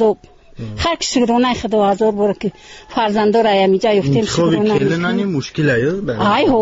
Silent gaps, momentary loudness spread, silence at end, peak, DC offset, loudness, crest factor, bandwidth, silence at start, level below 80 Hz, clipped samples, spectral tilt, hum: none; 8 LU; 0 s; -4 dBFS; under 0.1%; -16 LUFS; 12 dB; 8 kHz; 0 s; -42 dBFS; under 0.1%; -4.5 dB/octave; none